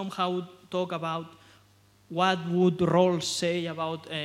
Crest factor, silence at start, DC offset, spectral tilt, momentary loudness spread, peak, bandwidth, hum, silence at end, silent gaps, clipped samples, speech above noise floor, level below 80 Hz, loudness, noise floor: 20 dB; 0 s; under 0.1%; -5 dB/octave; 12 LU; -10 dBFS; 13 kHz; 50 Hz at -60 dBFS; 0 s; none; under 0.1%; 33 dB; -68 dBFS; -28 LUFS; -60 dBFS